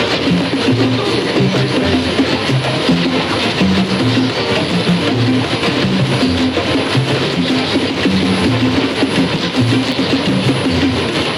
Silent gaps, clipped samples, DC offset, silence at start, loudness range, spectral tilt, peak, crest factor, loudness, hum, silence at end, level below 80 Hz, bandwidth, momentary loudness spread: none; under 0.1%; under 0.1%; 0 s; 0 LU; -5.5 dB/octave; -6 dBFS; 8 dB; -14 LUFS; none; 0 s; -40 dBFS; 13 kHz; 1 LU